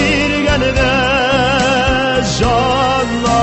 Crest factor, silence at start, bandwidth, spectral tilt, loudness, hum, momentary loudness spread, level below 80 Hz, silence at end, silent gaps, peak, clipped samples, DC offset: 12 dB; 0 s; 8.6 kHz; -4.5 dB/octave; -13 LUFS; none; 2 LU; -26 dBFS; 0 s; none; -2 dBFS; under 0.1%; under 0.1%